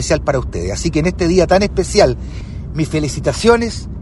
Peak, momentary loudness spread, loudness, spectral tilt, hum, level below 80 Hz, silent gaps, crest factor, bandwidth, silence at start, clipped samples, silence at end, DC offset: 0 dBFS; 11 LU; -16 LUFS; -5.5 dB/octave; none; -28 dBFS; none; 16 dB; 11.5 kHz; 0 s; under 0.1%; 0 s; under 0.1%